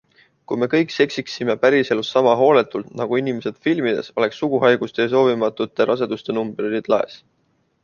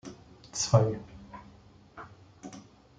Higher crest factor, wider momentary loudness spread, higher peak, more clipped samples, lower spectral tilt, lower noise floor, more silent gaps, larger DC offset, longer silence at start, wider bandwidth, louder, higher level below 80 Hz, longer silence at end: second, 18 dB vs 26 dB; second, 8 LU vs 26 LU; first, -2 dBFS vs -8 dBFS; neither; about the same, -6 dB/octave vs -5 dB/octave; first, -65 dBFS vs -56 dBFS; neither; neither; first, 0.5 s vs 0.05 s; second, 7.2 kHz vs 9.2 kHz; first, -19 LUFS vs -28 LUFS; about the same, -64 dBFS vs -60 dBFS; first, 0.65 s vs 0.4 s